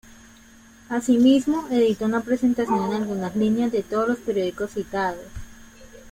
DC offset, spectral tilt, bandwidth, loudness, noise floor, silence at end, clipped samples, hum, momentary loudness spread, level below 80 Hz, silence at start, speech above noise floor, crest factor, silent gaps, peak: under 0.1%; -6 dB/octave; 16 kHz; -22 LUFS; -49 dBFS; 0 s; under 0.1%; none; 11 LU; -50 dBFS; 0.9 s; 28 dB; 16 dB; none; -8 dBFS